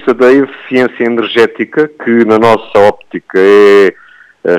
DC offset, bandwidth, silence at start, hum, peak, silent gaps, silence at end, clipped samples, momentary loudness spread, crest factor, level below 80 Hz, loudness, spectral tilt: under 0.1%; 10.5 kHz; 0.05 s; none; 0 dBFS; none; 0 s; under 0.1%; 8 LU; 8 dB; -50 dBFS; -9 LUFS; -6 dB/octave